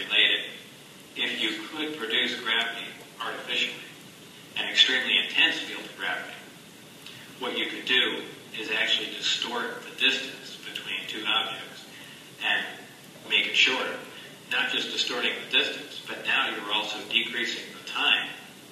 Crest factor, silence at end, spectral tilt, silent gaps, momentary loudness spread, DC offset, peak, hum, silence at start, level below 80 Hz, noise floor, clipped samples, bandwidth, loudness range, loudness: 24 dB; 0 s; -1 dB/octave; none; 22 LU; under 0.1%; -4 dBFS; none; 0 s; -80 dBFS; -48 dBFS; under 0.1%; 15 kHz; 4 LU; -25 LUFS